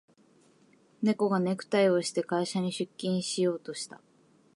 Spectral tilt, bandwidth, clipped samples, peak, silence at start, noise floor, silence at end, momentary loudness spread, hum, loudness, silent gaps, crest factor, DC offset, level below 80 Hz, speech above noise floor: -5 dB/octave; 11.5 kHz; under 0.1%; -14 dBFS; 1 s; -63 dBFS; 0.6 s; 11 LU; none; -29 LUFS; none; 16 dB; under 0.1%; -80 dBFS; 34 dB